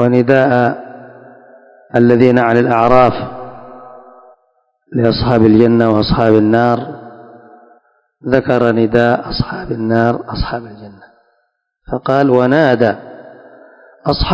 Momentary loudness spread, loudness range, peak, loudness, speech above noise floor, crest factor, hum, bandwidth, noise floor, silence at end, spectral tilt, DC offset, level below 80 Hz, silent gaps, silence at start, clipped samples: 17 LU; 4 LU; 0 dBFS; -12 LUFS; 53 dB; 14 dB; none; 8 kHz; -65 dBFS; 0 s; -8.5 dB/octave; under 0.1%; -34 dBFS; none; 0 s; 0.8%